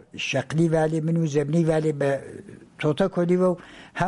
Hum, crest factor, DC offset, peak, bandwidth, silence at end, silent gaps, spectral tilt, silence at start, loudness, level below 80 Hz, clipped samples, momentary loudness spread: none; 16 dB; under 0.1%; -8 dBFS; 11.5 kHz; 0 s; none; -7 dB/octave; 0.15 s; -23 LUFS; -54 dBFS; under 0.1%; 11 LU